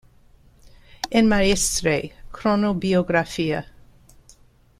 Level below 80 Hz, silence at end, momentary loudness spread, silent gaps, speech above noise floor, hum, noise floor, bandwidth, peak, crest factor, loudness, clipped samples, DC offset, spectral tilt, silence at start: -40 dBFS; 1.15 s; 9 LU; none; 33 dB; none; -53 dBFS; 15 kHz; -4 dBFS; 18 dB; -21 LUFS; under 0.1%; under 0.1%; -4 dB/octave; 0.65 s